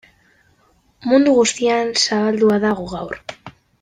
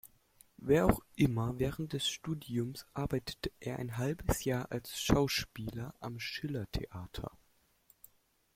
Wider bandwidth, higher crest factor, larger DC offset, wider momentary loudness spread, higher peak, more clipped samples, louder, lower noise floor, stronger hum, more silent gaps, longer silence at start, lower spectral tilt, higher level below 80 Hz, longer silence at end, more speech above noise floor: second, 10 kHz vs 16.5 kHz; second, 16 dB vs 26 dB; neither; about the same, 15 LU vs 13 LU; first, -2 dBFS vs -10 dBFS; neither; first, -16 LUFS vs -35 LUFS; second, -58 dBFS vs -71 dBFS; neither; neither; first, 1.05 s vs 0.05 s; second, -3.5 dB/octave vs -5.5 dB/octave; about the same, -54 dBFS vs -50 dBFS; second, 0.3 s vs 1.3 s; first, 41 dB vs 37 dB